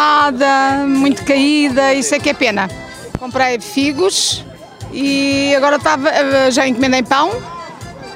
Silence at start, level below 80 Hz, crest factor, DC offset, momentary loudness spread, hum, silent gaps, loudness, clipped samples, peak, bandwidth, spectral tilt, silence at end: 0 s; -44 dBFS; 14 dB; under 0.1%; 15 LU; none; none; -13 LUFS; under 0.1%; 0 dBFS; 16 kHz; -3 dB/octave; 0 s